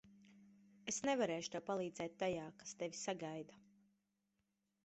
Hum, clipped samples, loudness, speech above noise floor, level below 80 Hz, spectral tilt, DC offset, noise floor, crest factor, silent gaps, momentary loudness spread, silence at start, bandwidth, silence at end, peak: none; under 0.1%; -43 LUFS; 43 dB; -80 dBFS; -3.5 dB/octave; under 0.1%; -86 dBFS; 20 dB; none; 13 LU; 0.05 s; 8.2 kHz; 1.25 s; -26 dBFS